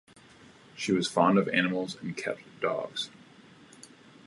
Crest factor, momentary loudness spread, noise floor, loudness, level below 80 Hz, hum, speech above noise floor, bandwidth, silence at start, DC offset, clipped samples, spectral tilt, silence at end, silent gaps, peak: 22 dB; 12 LU; -55 dBFS; -29 LUFS; -72 dBFS; none; 26 dB; 11.5 kHz; 0.75 s; under 0.1%; under 0.1%; -5 dB/octave; 1.15 s; none; -10 dBFS